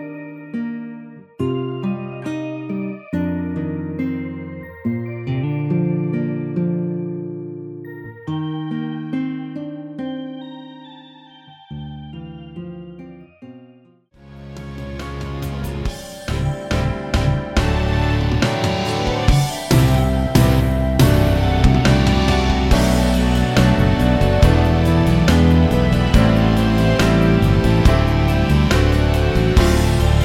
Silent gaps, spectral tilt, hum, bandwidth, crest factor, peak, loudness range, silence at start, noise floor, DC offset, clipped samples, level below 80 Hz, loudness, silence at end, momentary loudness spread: none; -6.5 dB/octave; none; 16.5 kHz; 16 dB; 0 dBFS; 18 LU; 0 s; -50 dBFS; under 0.1%; under 0.1%; -24 dBFS; -18 LUFS; 0 s; 18 LU